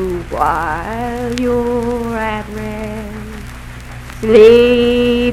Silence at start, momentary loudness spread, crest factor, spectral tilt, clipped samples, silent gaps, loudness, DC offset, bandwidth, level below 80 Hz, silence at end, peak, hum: 0 s; 23 LU; 14 dB; -6 dB/octave; 0.6%; none; -14 LUFS; under 0.1%; 14.5 kHz; -30 dBFS; 0 s; 0 dBFS; none